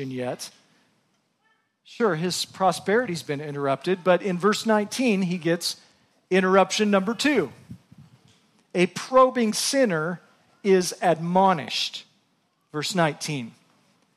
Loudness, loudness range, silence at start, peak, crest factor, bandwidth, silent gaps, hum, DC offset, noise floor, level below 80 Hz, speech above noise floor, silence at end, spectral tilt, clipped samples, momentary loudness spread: -23 LUFS; 4 LU; 0 s; -6 dBFS; 18 dB; 15 kHz; none; none; under 0.1%; -69 dBFS; -72 dBFS; 46 dB; 0.65 s; -4.5 dB/octave; under 0.1%; 12 LU